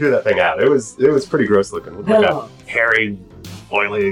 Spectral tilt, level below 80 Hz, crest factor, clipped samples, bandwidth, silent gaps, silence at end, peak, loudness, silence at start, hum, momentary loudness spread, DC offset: -5 dB/octave; -50 dBFS; 14 dB; under 0.1%; 11.5 kHz; none; 0 s; -4 dBFS; -16 LUFS; 0 s; none; 11 LU; under 0.1%